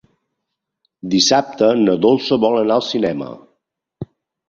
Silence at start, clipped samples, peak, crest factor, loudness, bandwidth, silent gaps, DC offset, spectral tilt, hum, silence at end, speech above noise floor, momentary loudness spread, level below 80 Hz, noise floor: 1.05 s; under 0.1%; -2 dBFS; 16 dB; -16 LUFS; 7.8 kHz; none; under 0.1%; -4 dB/octave; none; 0.45 s; 63 dB; 21 LU; -56 dBFS; -78 dBFS